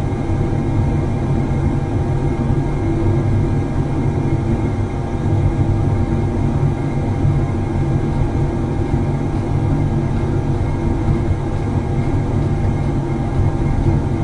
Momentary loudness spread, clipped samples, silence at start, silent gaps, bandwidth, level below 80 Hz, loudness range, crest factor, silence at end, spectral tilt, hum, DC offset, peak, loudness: 3 LU; under 0.1%; 0 s; none; 10.5 kHz; -24 dBFS; 1 LU; 12 dB; 0 s; -9 dB/octave; none; under 0.1%; -4 dBFS; -19 LUFS